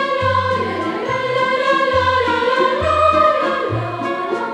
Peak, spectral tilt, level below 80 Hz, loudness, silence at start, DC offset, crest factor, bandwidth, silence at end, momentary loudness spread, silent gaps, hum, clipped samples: -2 dBFS; -5.5 dB/octave; -42 dBFS; -17 LUFS; 0 s; under 0.1%; 14 dB; 11 kHz; 0 s; 7 LU; none; none; under 0.1%